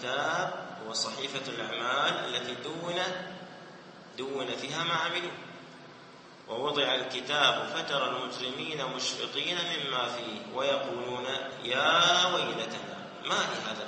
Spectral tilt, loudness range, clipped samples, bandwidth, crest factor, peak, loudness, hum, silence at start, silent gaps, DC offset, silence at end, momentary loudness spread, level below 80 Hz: -2.5 dB/octave; 6 LU; under 0.1%; 8.8 kHz; 22 dB; -10 dBFS; -30 LUFS; none; 0 s; none; under 0.1%; 0 s; 20 LU; -76 dBFS